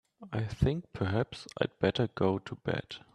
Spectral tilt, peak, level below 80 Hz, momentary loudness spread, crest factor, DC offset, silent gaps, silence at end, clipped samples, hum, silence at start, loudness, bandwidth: -7 dB/octave; -12 dBFS; -52 dBFS; 7 LU; 20 dB; under 0.1%; none; 0.15 s; under 0.1%; none; 0.2 s; -33 LUFS; 11 kHz